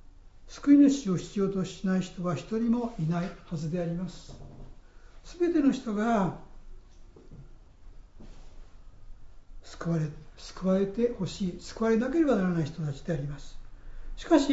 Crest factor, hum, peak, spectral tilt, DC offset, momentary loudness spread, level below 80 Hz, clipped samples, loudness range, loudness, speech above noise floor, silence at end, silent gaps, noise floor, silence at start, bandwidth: 20 dB; none; -10 dBFS; -7 dB/octave; under 0.1%; 20 LU; -48 dBFS; under 0.1%; 9 LU; -28 LUFS; 23 dB; 0 s; none; -50 dBFS; 0.05 s; 8 kHz